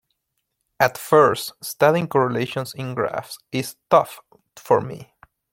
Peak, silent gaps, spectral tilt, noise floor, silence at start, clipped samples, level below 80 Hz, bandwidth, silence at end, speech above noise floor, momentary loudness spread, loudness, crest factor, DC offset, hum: -2 dBFS; none; -5 dB/octave; -76 dBFS; 0.8 s; under 0.1%; -62 dBFS; 16.5 kHz; 0.5 s; 55 dB; 14 LU; -21 LUFS; 20 dB; under 0.1%; none